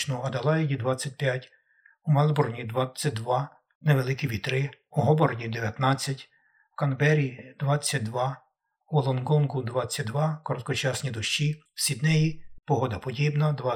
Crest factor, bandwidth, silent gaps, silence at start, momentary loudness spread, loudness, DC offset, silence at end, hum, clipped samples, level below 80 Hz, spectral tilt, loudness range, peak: 18 dB; 15.5 kHz; 3.75-3.81 s; 0 s; 8 LU; -27 LUFS; under 0.1%; 0 s; none; under 0.1%; -60 dBFS; -5.5 dB/octave; 1 LU; -8 dBFS